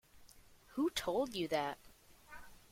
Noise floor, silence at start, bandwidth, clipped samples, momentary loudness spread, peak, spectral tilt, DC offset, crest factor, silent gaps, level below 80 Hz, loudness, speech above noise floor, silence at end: -62 dBFS; 0.15 s; 16.5 kHz; under 0.1%; 20 LU; -24 dBFS; -4 dB/octave; under 0.1%; 18 dB; none; -66 dBFS; -38 LUFS; 24 dB; 0.15 s